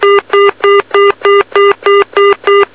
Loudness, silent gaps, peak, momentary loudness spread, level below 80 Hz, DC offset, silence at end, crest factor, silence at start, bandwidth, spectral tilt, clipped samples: -8 LUFS; none; 0 dBFS; 2 LU; -50 dBFS; 0.5%; 0.1 s; 8 dB; 0 s; 4 kHz; -6 dB/octave; under 0.1%